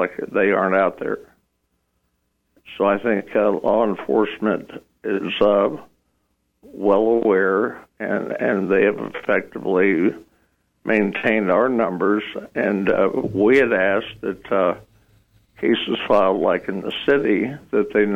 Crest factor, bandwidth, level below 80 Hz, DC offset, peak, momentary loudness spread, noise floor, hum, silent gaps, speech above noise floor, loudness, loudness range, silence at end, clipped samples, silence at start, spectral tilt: 16 dB; 7.6 kHz; -56 dBFS; under 0.1%; -6 dBFS; 10 LU; -70 dBFS; none; none; 51 dB; -20 LUFS; 3 LU; 0 s; under 0.1%; 0 s; -7.5 dB/octave